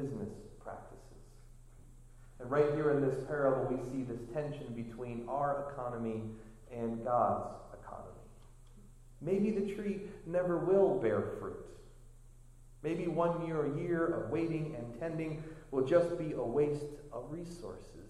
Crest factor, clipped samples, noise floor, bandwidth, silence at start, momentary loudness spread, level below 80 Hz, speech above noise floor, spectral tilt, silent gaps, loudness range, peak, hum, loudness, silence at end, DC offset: 20 dB; under 0.1%; -56 dBFS; 12.5 kHz; 0 s; 18 LU; -56 dBFS; 21 dB; -8 dB/octave; none; 4 LU; -16 dBFS; none; -35 LUFS; 0 s; under 0.1%